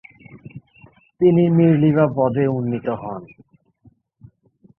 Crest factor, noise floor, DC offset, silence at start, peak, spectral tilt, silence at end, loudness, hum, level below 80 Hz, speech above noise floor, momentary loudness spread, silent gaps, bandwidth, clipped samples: 16 dB; -55 dBFS; under 0.1%; 0.35 s; -4 dBFS; -12.5 dB/octave; 1.55 s; -17 LUFS; none; -58 dBFS; 39 dB; 19 LU; none; 3.4 kHz; under 0.1%